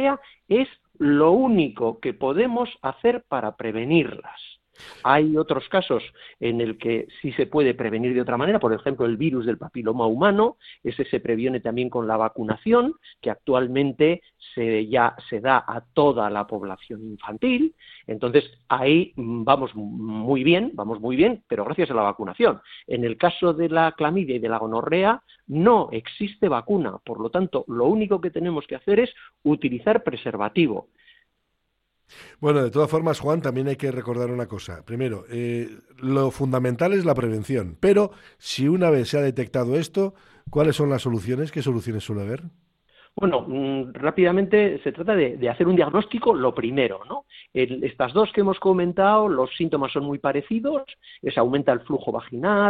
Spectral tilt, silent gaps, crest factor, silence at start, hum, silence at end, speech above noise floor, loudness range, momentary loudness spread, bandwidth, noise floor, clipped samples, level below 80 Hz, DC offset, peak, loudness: -7 dB/octave; none; 20 dB; 0 s; none; 0 s; 51 dB; 3 LU; 11 LU; 12.5 kHz; -74 dBFS; under 0.1%; -56 dBFS; under 0.1%; -2 dBFS; -23 LUFS